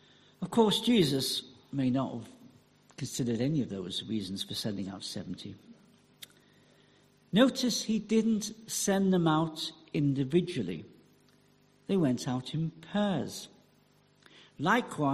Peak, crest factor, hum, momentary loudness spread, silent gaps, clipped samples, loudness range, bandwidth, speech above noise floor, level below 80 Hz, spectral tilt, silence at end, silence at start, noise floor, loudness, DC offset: -12 dBFS; 20 dB; 50 Hz at -60 dBFS; 17 LU; none; under 0.1%; 6 LU; 14.5 kHz; 35 dB; -66 dBFS; -5 dB/octave; 0 s; 0.4 s; -65 dBFS; -30 LUFS; under 0.1%